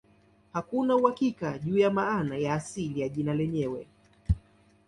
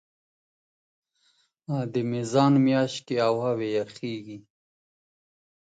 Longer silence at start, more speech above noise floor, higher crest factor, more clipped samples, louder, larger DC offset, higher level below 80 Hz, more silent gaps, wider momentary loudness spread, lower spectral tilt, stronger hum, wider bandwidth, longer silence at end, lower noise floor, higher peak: second, 0.55 s vs 1.7 s; second, 34 dB vs 43 dB; about the same, 20 dB vs 20 dB; neither; second, -29 LUFS vs -25 LUFS; neither; first, -44 dBFS vs -72 dBFS; neither; second, 10 LU vs 17 LU; about the same, -7 dB/octave vs -6.5 dB/octave; neither; first, 11.5 kHz vs 9.2 kHz; second, 0.5 s vs 1.4 s; second, -62 dBFS vs -68 dBFS; about the same, -8 dBFS vs -8 dBFS